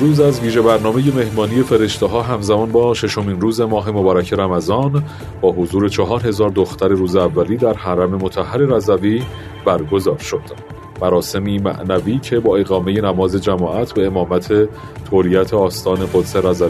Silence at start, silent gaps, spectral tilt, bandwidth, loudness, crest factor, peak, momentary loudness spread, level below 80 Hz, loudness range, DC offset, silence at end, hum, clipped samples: 0 s; none; -6.5 dB/octave; 14 kHz; -16 LUFS; 16 dB; 0 dBFS; 5 LU; -42 dBFS; 2 LU; under 0.1%; 0 s; none; under 0.1%